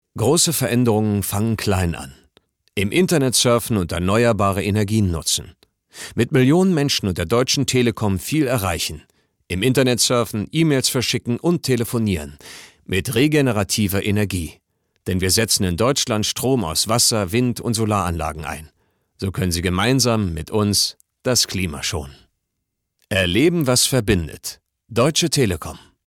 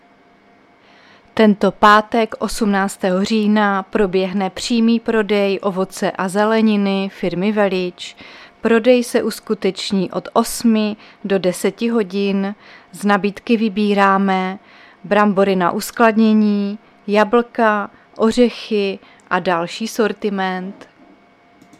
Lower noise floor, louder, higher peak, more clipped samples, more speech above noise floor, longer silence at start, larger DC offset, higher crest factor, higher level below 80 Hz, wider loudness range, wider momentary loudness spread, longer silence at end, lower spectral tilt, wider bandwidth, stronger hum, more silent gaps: first, -77 dBFS vs -50 dBFS; about the same, -19 LUFS vs -17 LUFS; second, -6 dBFS vs 0 dBFS; neither; first, 58 dB vs 34 dB; second, 0.15 s vs 1.35 s; neither; about the same, 14 dB vs 18 dB; about the same, -44 dBFS vs -48 dBFS; about the same, 2 LU vs 3 LU; about the same, 12 LU vs 10 LU; second, 0.3 s vs 1.05 s; second, -4 dB/octave vs -5.5 dB/octave; first, 18.5 kHz vs 14.5 kHz; neither; neither